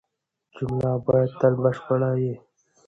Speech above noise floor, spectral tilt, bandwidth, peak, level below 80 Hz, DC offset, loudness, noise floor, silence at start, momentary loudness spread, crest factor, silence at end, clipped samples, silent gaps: 55 dB; -10 dB/octave; 7.6 kHz; -6 dBFS; -56 dBFS; under 0.1%; -23 LUFS; -77 dBFS; 0.55 s; 9 LU; 18 dB; 0.5 s; under 0.1%; none